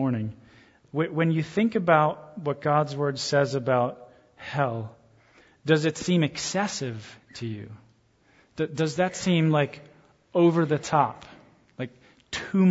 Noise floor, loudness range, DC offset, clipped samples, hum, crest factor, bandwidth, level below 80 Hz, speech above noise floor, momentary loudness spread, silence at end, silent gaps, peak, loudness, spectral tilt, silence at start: -62 dBFS; 4 LU; under 0.1%; under 0.1%; none; 22 dB; 8 kHz; -64 dBFS; 37 dB; 16 LU; 0 s; none; -6 dBFS; -26 LUFS; -6 dB/octave; 0 s